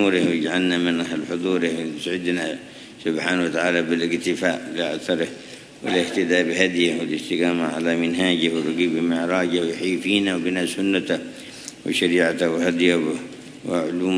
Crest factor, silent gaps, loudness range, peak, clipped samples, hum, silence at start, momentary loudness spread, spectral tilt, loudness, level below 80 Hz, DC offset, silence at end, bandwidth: 20 dB; none; 2 LU; -2 dBFS; under 0.1%; none; 0 s; 10 LU; -4.5 dB/octave; -22 LUFS; -64 dBFS; under 0.1%; 0 s; 11 kHz